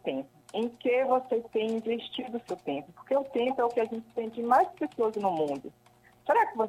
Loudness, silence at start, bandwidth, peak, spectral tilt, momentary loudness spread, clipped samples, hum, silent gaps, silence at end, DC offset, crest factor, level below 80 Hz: -30 LUFS; 0.05 s; 13.5 kHz; -12 dBFS; -5.5 dB/octave; 11 LU; under 0.1%; none; none; 0 s; under 0.1%; 18 dB; -74 dBFS